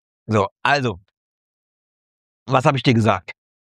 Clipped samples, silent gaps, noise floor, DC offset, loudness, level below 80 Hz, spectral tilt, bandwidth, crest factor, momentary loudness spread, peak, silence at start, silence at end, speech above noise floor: under 0.1%; 0.51-0.56 s, 1.17-2.46 s; under -90 dBFS; under 0.1%; -19 LUFS; -58 dBFS; -6 dB/octave; 11 kHz; 20 dB; 10 LU; -2 dBFS; 0.3 s; 0.45 s; over 72 dB